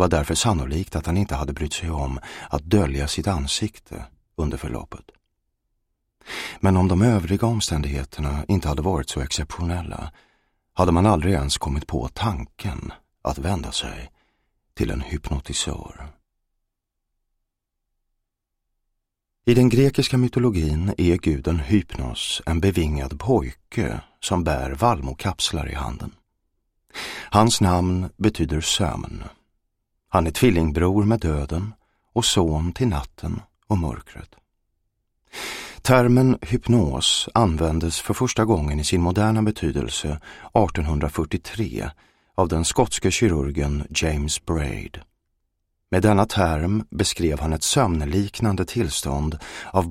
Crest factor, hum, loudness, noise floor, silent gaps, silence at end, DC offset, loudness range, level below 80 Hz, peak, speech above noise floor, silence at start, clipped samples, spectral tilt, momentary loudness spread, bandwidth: 22 dB; none; -22 LUFS; -79 dBFS; none; 0 s; under 0.1%; 8 LU; -34 dBFS; 0 dBFS; 57 dB; 0 s; under 0.1%; -5 dB/octave; 13 LU; 16 kHz